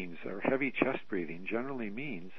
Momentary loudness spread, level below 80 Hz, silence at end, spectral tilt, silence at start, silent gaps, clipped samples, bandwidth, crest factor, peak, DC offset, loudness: 8 LU; -72 dBFS; 0 s; -8.5 dB/octave; 0 s; none; under 0.1%; 6 kHz; 26 dB; -10 dBFS; 0.7%; -35 LUFS